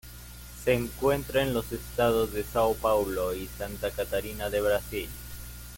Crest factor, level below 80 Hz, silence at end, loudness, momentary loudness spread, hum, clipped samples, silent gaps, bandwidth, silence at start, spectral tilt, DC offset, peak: 18 dB; -44 dBFS; 0 s; -29 LUFS; 15 LU; 60 Hz at -40 dBFS; under 0.1%; none; 17 kHz; 0.05 s; -5 dB/octave; under 0.1%; -12 dBFS